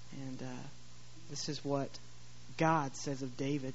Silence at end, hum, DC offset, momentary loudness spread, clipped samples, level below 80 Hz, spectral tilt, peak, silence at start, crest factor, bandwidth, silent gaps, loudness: 0 s; 60 Hz at -60 dBFS; 0.5%; 24 LU; under 0.1%; -68 dBFS; -5 dB/octave; -16 dBFS; 0 s; 22 dB; 8 kHz; none; -38 LUFS